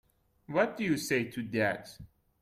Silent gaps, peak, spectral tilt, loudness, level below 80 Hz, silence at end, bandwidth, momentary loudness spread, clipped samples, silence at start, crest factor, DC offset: none; -14 dBFS; -5 dB/octave; -32 LUFS; -66 dBFS; 0.35 s; 16 kHz; 7 LU; under 0.1%; 0.5 s; 18 dB; under 0.1%